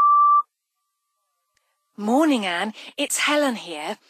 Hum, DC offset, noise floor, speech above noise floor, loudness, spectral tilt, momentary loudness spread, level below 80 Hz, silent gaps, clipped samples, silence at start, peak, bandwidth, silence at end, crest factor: none; under 0.1%; -78 dBFS; 55 dB; -21 LUFS; -2.5 dB/octave; 14 LU; -82 dBFS; none; under 0.1%; 0 s; -8 dBFS; 15.5 kHz; 0.15 s; 14 dB